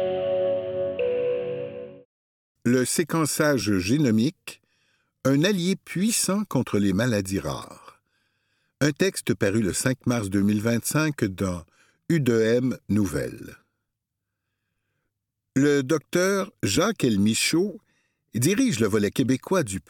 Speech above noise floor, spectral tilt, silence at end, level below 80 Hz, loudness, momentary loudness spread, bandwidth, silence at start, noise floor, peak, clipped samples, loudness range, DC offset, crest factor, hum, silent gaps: 60 dB; -5 dB/octave; 0.1 s; -56 dBFS; -24 LUFS; 9 LU; 18.5 kHz; 0 s; -83 dBFS; -6 dBFS; under 0.1%; 3 LU; under 0.1%; 18 dB; none; 2.05-2.55 s